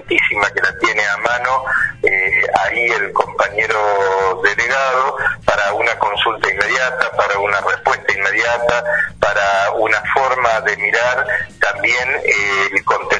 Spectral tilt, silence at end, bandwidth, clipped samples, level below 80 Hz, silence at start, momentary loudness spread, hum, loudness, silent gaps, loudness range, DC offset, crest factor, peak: -2.5 dB/octave; 0 s; 10.5 kHz; under 0.1%; -46 dBFS; 0 s; 3 LU; none; -15 LUFS; none; 1 LU; under 0.1%; 16 dB; 0 dBFS